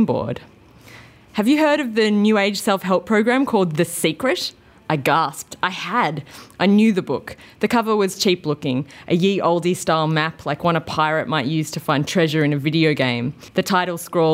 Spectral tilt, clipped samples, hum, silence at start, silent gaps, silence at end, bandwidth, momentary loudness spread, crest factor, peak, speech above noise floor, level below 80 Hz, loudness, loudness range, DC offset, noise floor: -5.5 dB/octave; under 0.1%; none; 0 s; none; 0 s; 16 kHz; 8 LU; 18 dB; -2 dBFS; 25 dB; -58 dBFS; -19 LUFS; 2 LU; under 0.1%; -44 dBFS